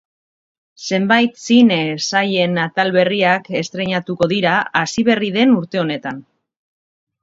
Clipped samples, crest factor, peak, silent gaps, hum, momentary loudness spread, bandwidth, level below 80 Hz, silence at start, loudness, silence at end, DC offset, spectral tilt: under 0.1%; 18 dB; 0 dBFS; none; none; 8 LU; 7.8 kHz; -60 dBFS; 0.8 s; -16 LUFS; 1 s; under 0.1%; -5 dB/octave